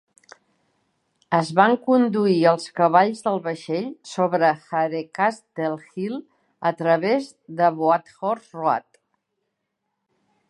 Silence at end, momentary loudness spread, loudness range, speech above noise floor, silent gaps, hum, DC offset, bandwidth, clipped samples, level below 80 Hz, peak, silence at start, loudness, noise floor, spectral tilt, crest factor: 1.7 s; 10 LU; 5 LU; 57 dB; none; none; under 0.1%; 11.5 kHz; under 0.1%; -76 dBFS; -2 dBFS; 1.3 s; -22 LUFS; -78 dBFS; -6.5 dB/octave; 22 dB